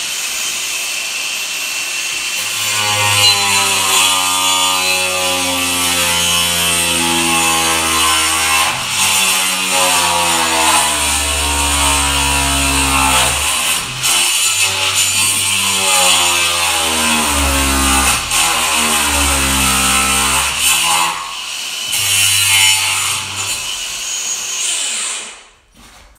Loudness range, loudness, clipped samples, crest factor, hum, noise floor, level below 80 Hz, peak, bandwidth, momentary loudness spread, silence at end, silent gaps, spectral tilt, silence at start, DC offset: 2 LU; -12 LUFS; under 0.1%; 14 dB; none; -43 dBFS; -32 dBFS; 0 dBFS; 16 kHz; 7 LU; 0.3 s; none; -0.5 dB/octave; 0 s; under 0.1%